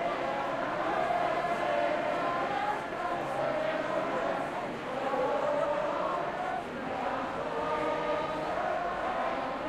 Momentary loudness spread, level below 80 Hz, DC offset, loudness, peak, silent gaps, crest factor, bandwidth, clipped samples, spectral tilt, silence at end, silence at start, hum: 4 LU; -60 dBFS; under 0.1%; -32 LUFS; -18 dBFS; none; 14 dB; 13.5 kHz; under 0.1%; -5 dB/octave; 0 s; 0 s; none